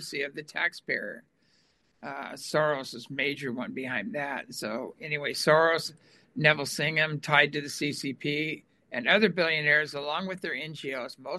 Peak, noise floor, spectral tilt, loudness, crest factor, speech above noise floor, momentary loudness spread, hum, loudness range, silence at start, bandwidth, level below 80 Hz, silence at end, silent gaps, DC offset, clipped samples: -6 dBFS; -68 dBFS; -4 dB/octave; -28 LUFS; 24 dB; 39 dB; 14 LU; none; 7 LU; 0 s; 12.5 kHz; -74 dBFS; 0 s; none; under 0.1%; under 0.1%